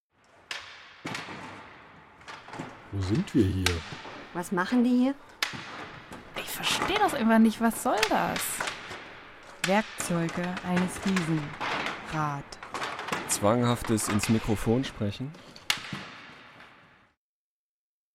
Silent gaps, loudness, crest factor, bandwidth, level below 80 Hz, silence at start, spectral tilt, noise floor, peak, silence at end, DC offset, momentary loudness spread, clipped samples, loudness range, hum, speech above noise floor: none; -28 LUFS; 20 dB; 16 kHz; -52 dBFS; 0.5 s; -4.5 dB/octave; under -90 dBFS; -10 dBFS; 1.45 s; under 0.1%; 18 LU; under 0.1%; 5 LU; none; over 63 dB